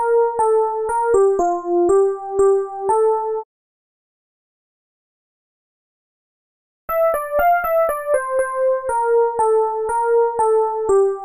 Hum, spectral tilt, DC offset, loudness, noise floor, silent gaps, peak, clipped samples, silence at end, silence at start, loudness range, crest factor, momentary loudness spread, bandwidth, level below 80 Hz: none; -5.5 dB/octave; under 0.1%; -18 LUFS; under -90 dBFS; 3.45-6.88 s; -4 dBFS; under 0.1%; 0 s; 0 s; 9 LU; 14 dB; 4 LU; 15.5 kHz; -50 dBFS